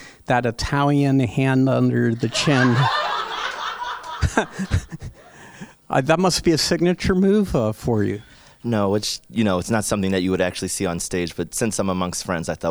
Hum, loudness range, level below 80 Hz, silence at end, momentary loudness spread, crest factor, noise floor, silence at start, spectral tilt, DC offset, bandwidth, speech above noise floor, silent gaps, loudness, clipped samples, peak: none; 4 LU; -40 dBFS; 0 s; 9 LU; 18 dB; -44 dBFS; 0 s; -5 dB/octave; under 0.1%; over 20 kHz; 24 dB; none; -21 LUFS; under 0.1%; -4 dBFS